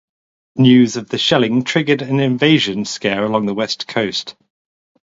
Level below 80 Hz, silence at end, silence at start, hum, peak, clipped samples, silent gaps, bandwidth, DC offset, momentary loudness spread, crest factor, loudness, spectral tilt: -58 dBFS; 0.75 s; 0.55 s; none; 0 dBFS; under 0.1%; none; 7.8 kHz; under 0.1%; 9 LU; 16 dB; -16 LUFS; -5.5 dB/octave